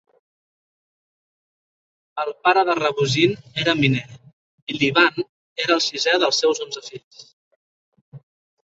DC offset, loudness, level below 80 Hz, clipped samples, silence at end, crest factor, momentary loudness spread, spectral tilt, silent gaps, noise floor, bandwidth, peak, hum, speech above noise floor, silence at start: under 0.1%; -20 LUFS; -62 dBFS; under 0.1%; 0.55 s; 20 dB; 14 LU; -4 dB/octave; 4.33-4.67 s, 5.29-5.56 s, 7.04-7.11 s, 7.33-7.92 s, 8.01-8.12 s; under -90 dBFS; 8 kHz; -2 dBFS; none; over 70 dB; 2.15 s